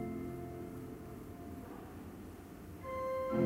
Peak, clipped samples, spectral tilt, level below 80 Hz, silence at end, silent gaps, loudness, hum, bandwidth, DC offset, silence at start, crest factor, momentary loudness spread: -22 dBFS; under 0.1%; -7.5 dB/octave; -60 dBFS; 0 s; none; -45 LUFS; none; 16 kHz; under 0.1%; 0 s; 20 dB; 12 LU